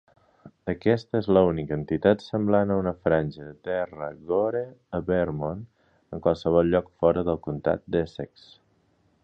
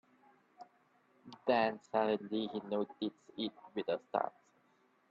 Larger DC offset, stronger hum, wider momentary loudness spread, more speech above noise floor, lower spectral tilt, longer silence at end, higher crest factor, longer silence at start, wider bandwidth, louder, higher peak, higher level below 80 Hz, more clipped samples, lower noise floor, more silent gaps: neither; neither; about the same, 12 LU vs 10 LU; first, 41 dB vs 36 dB; first, -9 dB/octave vs -6.5 dB/octave; first, 1 s vs 0.8 s; about the same, 20 dB vs 22 dB; second, 0.45 s vs 0.6 s; about the same, 7 kHz vs 7.6 kHz; first, -25 LUFS vs -37 LUFS; first, -6 dBFS vs -16 dBFS; first, -48 dBFS vs -84 dBFS; neither; second, -66 dBFS vs -72 dBFS; neither